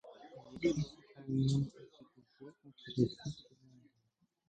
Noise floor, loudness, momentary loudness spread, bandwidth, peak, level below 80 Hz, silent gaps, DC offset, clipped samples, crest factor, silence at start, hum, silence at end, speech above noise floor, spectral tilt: -79 dBFS; -37 LUFS; 23 LU; 9 kHz; -18 dBFS; -64 dBFS; none; under 0.1%; under 0.1%; 20 dB; 0.05 s; none; 1.1 s; 44 dB; -7 dB/octave